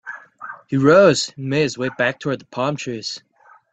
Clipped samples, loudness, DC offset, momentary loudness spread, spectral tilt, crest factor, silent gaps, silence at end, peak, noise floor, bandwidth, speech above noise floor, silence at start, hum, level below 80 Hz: under 0.1%; -19 LUFS; under 0.1%; 22 LU; -5 dB/octave; 18 dB; none; 0.55 s; -2 dBFS; -38 dBFS; 9 kHz; 20 dB; 0.05 s; none; -60 dBFS